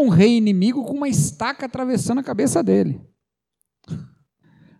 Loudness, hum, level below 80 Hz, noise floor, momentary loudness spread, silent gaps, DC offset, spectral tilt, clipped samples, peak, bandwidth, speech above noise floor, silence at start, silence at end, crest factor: -19 LUFS; none; -54 dBFS; -76 dBFS; 19 LU; none; under 0.1%; -6 dB/octave; under 0.1%; -4 dBFS; 14 kHz; 58 dB; 0 s; 0.75 s; 16 dB